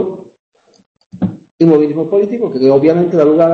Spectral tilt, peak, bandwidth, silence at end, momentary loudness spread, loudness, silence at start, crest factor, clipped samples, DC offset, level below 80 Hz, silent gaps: -9.5 dB/octave; 0 dBFS; 6.6 kHz; 0 s; 11 LU; -12 LUFS; 0 s; 12 dB; under 0.1%; under 0.1%; -54 dBFS; 0.40-0.52 s, 0.86-0.95 s, 1.51-1.58 s